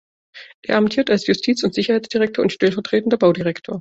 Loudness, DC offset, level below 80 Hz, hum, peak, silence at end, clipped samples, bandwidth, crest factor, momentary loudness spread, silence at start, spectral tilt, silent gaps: -18 LUFS; under 0.1%; -58 dBFS; none; -4 dBFS; 0 s; under 0.1%; 8 kHz; 16 dB; 5 LU; 0.35 s; -5.5 dB/octave; 0.54-0.62 s